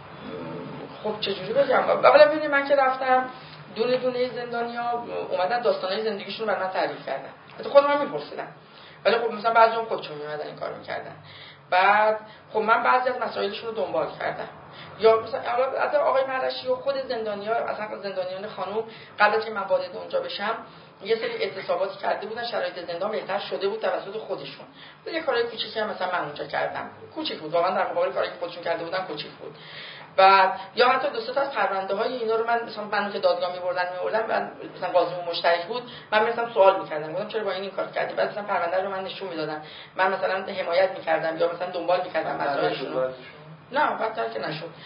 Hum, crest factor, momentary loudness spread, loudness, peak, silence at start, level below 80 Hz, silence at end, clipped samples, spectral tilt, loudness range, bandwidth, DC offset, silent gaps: none; 24 dB; 15 LU; -25 LUFS; -2 dBFS; 0 s; -70 dBFS; 0 s; under 0.1%; -8.5 dB/octave; 7 LU; 5.4 kHz; under 0.1%; none